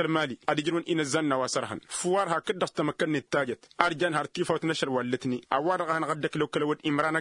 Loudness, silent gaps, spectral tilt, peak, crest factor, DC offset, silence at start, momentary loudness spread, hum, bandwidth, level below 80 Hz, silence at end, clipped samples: -28 LUFS; none; -4.5 dB/octave; -2 dBFS; 26 dB; under 0.1%; 0 s; 3 LU; none; 11 kHz; -70 dBFS; 0 s; under 0.1%